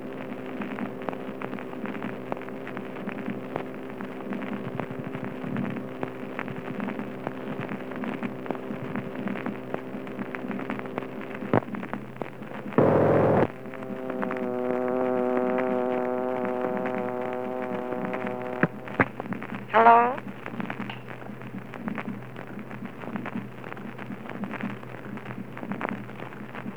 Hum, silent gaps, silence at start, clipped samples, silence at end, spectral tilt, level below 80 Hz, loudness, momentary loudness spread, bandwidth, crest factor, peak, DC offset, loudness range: none; none; 0 s; under 0.1%; 0 s; -8 dB/octave; -62 dBFS; -30 LUFS; 13 LU; over 20 kHz; 26 dB; -4 dBFS; 0.5%; 11 LU